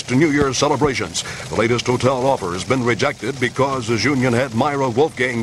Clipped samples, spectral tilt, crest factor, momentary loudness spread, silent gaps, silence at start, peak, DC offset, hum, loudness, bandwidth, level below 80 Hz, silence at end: under 0.1%; -5 dB/octave; 16 dB; 5 LU; none; 0 s; -2 dBFS; under 0.1%; none; -18 LUFS; 13 kHz; -44 dBFS; 0 s